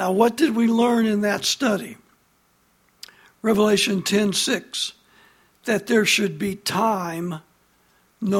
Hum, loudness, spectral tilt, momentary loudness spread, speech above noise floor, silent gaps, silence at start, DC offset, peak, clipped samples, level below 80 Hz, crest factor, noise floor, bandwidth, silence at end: none; -21 LUFS; -4 dB/octave; 11 LU; 42 dB; none; 0 s; under 0.1%; -4 dBFS; under 0.1%; -62 dBFS; 18 dB; -62 dBFS; 16.5 kHz; 0 s